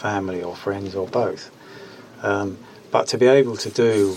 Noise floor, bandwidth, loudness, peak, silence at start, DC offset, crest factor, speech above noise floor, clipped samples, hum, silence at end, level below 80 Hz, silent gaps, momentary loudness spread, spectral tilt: -41 dBFS; 14 kHz; -21 LUFS; -4 dBFS; 0 s; under 0.1%; 18 dB; 21 dB; under 0.1%; none; 0 s; -66 dBFS; none; 24 LU; -5 dB/octave